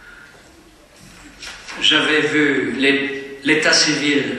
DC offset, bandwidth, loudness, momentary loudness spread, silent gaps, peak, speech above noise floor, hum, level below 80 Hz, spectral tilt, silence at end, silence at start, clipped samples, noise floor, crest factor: under 0.1%; 12 kHz; -16 LUFS; 18 LU; none; -2 dBFS; 30 dB; none; -54 dBFS; -2.5 dB/octave; 0 s; 0.05 s; under 0.1%; -47 dBFS; 18 dB